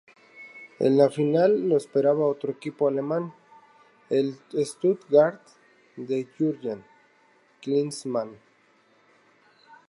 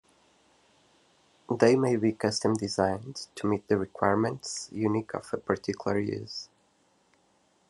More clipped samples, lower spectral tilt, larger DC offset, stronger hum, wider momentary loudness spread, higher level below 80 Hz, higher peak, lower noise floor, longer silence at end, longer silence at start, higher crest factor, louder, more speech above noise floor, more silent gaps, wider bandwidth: neither; first, -7 dB/octave vs -5.5 dB/octave; neither; neither; first, 18 LU vs 12 LU; second, -80 dBFS vs -70 dBFS; about the same, -6 dBFS vs -6 dBFS; second, -62 dBFS vs -68 dBFS; first, 1.55 s vs 1.25 s; second, 0.4 s vs 1.5 s; about the same, 20 dB vs 24 dB; first, -25 LUFS vs -29 LUFS; about the same, 38 dB vs 40 dB; neither; about the same, 11.5 kHz vs 12 kHz